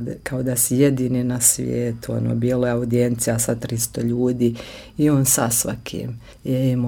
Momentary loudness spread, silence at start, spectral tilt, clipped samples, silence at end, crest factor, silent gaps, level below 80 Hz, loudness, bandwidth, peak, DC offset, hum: 12 LU; 0 s; -5 dB/octave; under 0.1%; 0 s; 18 dB; none; -46 dBFS; -20 LUFS; 18 kHz; -2 dBFS; under 0.1%; none